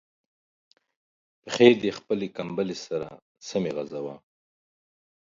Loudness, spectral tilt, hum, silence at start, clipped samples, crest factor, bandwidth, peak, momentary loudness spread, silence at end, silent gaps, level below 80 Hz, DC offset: -26 LUFS; -5 dB/octave; none; 1.45 s; under 0.1%; 26 dB; 7.6 kHz; -2 dBFS; 18 LU; 1.05 s; 3.22-3.35 s; -68 dBFS; under 0.1%